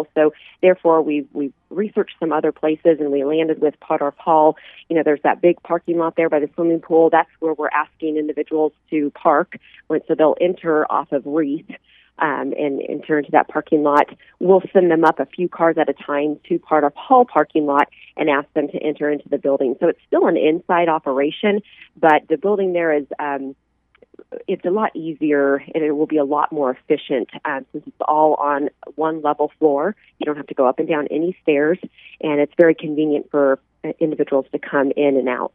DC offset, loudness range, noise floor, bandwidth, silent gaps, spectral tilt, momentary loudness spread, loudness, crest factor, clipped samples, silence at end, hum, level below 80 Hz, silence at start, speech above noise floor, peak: under 0.1%; 3 LU; -54 dBFS; 3.9 kHz; none; -8.5 dB/octave; 9 LU; -19 LUFS; 18 dB; under 0.1%; 0.1 s; none; -68 dBFS; 0 s; 36 dB; 0 dBFS